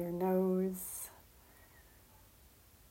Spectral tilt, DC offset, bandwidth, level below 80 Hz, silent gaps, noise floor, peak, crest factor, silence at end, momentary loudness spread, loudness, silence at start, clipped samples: -7 dB/octave; under 0.1%; 16 kHz; -66 dBFS; none; -62 dBFS; -22 dBFS; 16 dB; 1.1 s; 13 LU; -36 LUFS; 0 s; under 0.1%